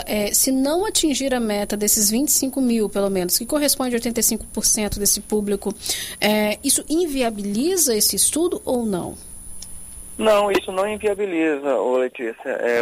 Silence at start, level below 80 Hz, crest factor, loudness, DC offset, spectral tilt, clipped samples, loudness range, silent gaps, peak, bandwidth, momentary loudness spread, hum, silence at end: 0 s; -44 dBFS; 16 dB; -19 LUFS; under 0.1%; -2.5 dB/octave; under 0.1%; 3 LU; none; -6 dBFS; 16 kHz; 9 LU; none; 0 s